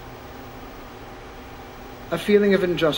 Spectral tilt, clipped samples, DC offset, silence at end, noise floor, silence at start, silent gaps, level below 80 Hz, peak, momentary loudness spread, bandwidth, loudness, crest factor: -6 dB/octave; under 0.1%; under 0.1%; 0 s; -39 dBFS; 0 s; none; -46 dBFS; -6 dBFS; 21 LU; 16.5 kHz; -20 LUFS; 20 dB